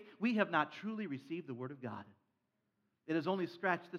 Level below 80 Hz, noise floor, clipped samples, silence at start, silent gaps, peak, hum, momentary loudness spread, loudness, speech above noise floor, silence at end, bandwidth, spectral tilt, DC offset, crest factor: under -90 dBFS; -84 dBFS; under 0.1%; 0 s; none; -16 dBFS; none; 13 LU; -38 LUFS; 46 dB; 0 s; 7 kHz; -7 dB/octave; under 0.1%; 22 dB